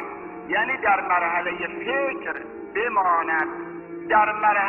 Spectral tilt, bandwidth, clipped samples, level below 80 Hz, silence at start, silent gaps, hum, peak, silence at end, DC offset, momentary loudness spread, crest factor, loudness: -6.5 dB/octave; 3.8 kHz; under 0.1%; -60 dBFS; 0 s; none; none; -6 dBFS; 0 s; under 0.1%; 14 LU; 18 dB; -23 LUFS